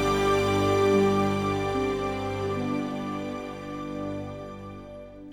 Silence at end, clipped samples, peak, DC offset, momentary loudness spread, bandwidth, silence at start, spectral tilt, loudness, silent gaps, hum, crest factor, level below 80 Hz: 0 s; under 0.1%; -12 dBFS; under 0.1%; 18 LU; 16 kHz; 0 s; -6 dB/octave; -27 LUFS; none; 50 Hz at -50 dBFS; 14 dB; -48 dBFS